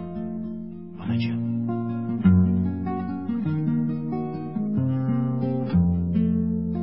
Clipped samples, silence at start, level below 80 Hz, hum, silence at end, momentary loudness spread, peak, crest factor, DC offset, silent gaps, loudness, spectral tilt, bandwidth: under 0.1%; 0 s; -38 dBFS; none; 0 s; 11 LU; -8 dBFS; 16 dB; 0.5%; none; -25 LUFS; -13 dB/octave; 5.8 kHz